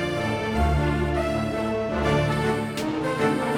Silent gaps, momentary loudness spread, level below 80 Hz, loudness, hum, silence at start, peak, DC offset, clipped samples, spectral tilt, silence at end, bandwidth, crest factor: none; 4 LU; -34 dBFS; -24 LUFS; none; 0 s; -10 dBFS; under 0.1%; under 0.1%; -6.5 dB/octave; 0 s; 16.5 kHz; 14 dB